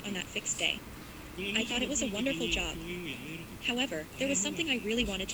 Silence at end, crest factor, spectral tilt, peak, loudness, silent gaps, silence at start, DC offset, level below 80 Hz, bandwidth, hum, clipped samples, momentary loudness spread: 0 s; 20 dB; -2.5 dB/octave; -14 dBFS; -32 LUFS; none; 0 s; under 0.1%; -50 dBFS; over 20 kHz; none; under 0.1%; 9 LU